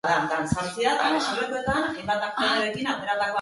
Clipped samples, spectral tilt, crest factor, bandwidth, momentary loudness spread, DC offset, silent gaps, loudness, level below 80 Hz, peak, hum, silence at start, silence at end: under 0.1%; -4 dB/octave; 16 dB; 11.5 kHz; 4 LU; under 0.1%; none; -25 LUFS; -52 dBFS; -10 dBFS; none; 0.05 s; 0 s